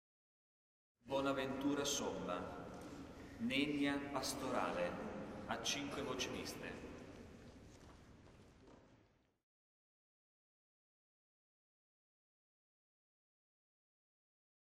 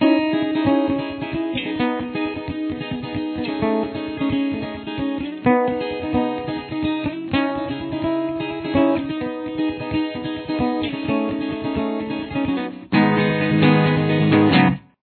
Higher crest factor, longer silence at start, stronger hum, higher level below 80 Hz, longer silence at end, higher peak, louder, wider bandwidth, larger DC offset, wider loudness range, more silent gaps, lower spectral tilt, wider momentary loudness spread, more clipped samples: about the same, 22 dB vs 18 dB; first, 1.05 s vs 0 s; neither; second, -68 dBFS vs -48 dBFS; first, 5.8 s vs 0.25 s; second, -24 dBFS vs -2 dBFS; second, -42 LUFS vs -21 LUFS; first, 15.5 kHz vs 4.5 kHz; neither; first, 15 LU vs 5 LU; neither; second, -3.5 dB/octave vs -10.5 dB/octave; first, 21 LU vs 10 LU; neither